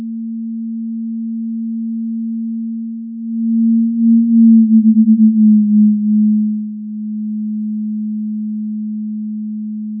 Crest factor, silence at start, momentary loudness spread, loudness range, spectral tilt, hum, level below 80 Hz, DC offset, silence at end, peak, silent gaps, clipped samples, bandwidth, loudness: 12 dB; 0 s; 14 LU; 11 LU; -17 dB/octave; none; -82 dBFS; under 0.1%; 0 s; -2 dBFS; none; under 0.1%; 0.3 kHz; -15 LUFS